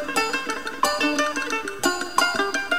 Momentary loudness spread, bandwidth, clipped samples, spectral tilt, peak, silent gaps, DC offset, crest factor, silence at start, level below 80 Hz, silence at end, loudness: 5 LU; 16 kHz; under 0.1%; -1 dB/octave; -2 dBFS; none; 0.9%; 22 dB; 0 s; -56 dBFS; 0 s; -23 LUFS